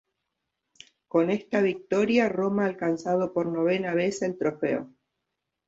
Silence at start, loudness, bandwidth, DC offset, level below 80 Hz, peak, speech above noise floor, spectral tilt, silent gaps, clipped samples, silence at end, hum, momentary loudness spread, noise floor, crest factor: 1.15 s; -26 LUFS; 8 kHz; under 0.1%; -68 dBFS; -10 dBFS; 57 dB; -6 dB/octave; none; under 0.1%; 0.8 s; none; 5 LU; -83 dBFS; 16 dB